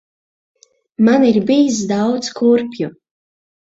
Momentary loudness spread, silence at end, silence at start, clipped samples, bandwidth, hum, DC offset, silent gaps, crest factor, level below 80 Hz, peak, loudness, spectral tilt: 13 LU; 0.7 s; 1 s; under 0.1%; 8 kHz; none; under 0.1%; none; 14 dB; -60 dBFS; -2 dBFS; -15 LUFS; -5.5 dB/octave